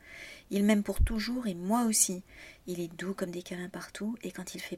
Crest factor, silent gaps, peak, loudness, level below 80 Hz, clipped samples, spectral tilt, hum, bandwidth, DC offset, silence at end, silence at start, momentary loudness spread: 20 dB; none; -12 dBFS; -32 LUFS; -42 dBFS; under 0.1%; -4 dB/octave; none; 16 kHz; under 0.1%; 0 s; 0.05 s; 15 LU